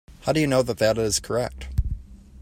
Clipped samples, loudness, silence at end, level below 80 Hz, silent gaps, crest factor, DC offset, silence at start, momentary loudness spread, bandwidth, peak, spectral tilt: under 0.1%; -24 LUFS; 0 s; -34 dBFS; none; 18 dB; under 0.1%; 0.1 s; 9 LU; 16.5 kHz; -6 dBFS; -4.5 dB/octave